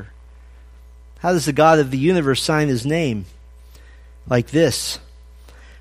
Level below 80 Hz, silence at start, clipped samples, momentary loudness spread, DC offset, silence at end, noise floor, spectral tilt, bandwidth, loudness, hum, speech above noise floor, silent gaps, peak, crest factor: -42 dBFS; 0 s; under 0.1%; 12 LU; under 0.1%; 0.8 s; -43 dBFS; -5 dB/octave; 15.5 kHz; -18 LUFS; none; 25 dB; none; -2 dBFS; 18 dB